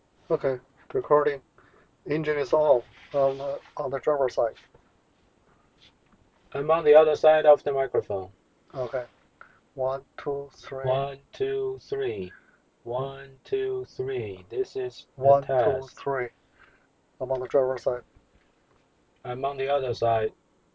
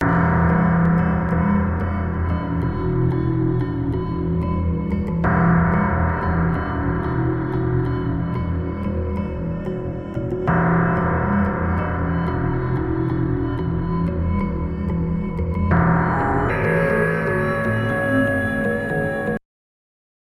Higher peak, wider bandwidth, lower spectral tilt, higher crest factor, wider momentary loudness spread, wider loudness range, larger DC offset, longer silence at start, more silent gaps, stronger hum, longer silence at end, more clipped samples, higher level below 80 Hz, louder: about the same, -6 dBFS vs -4 dBFS; second, 7.6 kHz vs 10 kHz; second, -7 dB/octave vs -9.5 dB/octave; about the same, 20 dB vs 16 dB; first, 16 LU vs 7 LU; first, 9 LU vs 3 LU; neither; first, 0.3 s vs 0 s; neither; neither; second, 0.45 s vs 0.9 s; neither; second, -60 dBFS vs -32 dBFS; second, -26 LUFS vs -21 LUFS